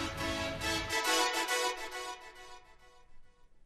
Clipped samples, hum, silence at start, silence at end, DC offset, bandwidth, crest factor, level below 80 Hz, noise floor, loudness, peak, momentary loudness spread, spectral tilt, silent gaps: under 0.1%; none; 0 s; 0.05 s; under 0.1%; 13.5 kHz; 20 dB; -54 dBFS; -58 dBFS; -33 LUFS; -16 dBFS; 20 LU; -2 dB/octave; none